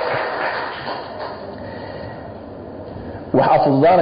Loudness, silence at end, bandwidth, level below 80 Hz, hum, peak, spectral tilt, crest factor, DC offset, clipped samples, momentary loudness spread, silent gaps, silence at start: -19 LUFS; 0 s; 5.2 kHz; -48 dBFS; none; -4 dBFS; -11.5 dB/octave; 16 dB; under 0.1%; under 0.1%; 19 LU; none; 0 s